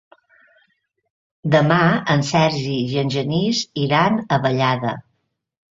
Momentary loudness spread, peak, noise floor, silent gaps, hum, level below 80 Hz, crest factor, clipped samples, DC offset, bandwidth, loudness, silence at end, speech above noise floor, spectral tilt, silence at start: 7 LU; -2 dBFS; -71 dBFS; none; none; -56 dBFS; 18 dB; under 0.1%; under 0.1%; 7.8 kHz; -19 LUFS; 0.75 s; 53 dB; -5.5 dB/octave; 1.45 s